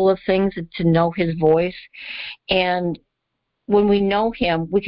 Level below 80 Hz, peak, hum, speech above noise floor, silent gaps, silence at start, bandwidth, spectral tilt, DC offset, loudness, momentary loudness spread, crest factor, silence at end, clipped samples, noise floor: -46 dBFS; -4 dBFS; none; 58 dB; none; 0 s; 5.6 kHz; -11.5 dB/octave; under 0.1%; -19 LUFS; 13 LU; 16 dB; 0 s; under 0.1%; -77 dBFS